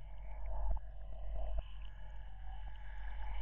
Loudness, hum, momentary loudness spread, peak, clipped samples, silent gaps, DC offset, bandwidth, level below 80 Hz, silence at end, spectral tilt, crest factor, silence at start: -48 LUFS; none; 9 LU; -24 dBFS; under 0.1%; none; under 0.1%; 3.6 kHz; -44 dBFS; 0 s; -5 dB/octave; 14 dB; 0 s